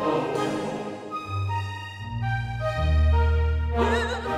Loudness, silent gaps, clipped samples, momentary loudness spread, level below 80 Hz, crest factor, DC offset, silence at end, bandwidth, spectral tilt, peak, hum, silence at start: -26 LUFS; none; under 0.1%; 12 LU; -28 dBFS; 14 dB; under 0.1%; 0 s; 9.4 kHz; -7 dB/octave; -10 dBFS; none; 0 s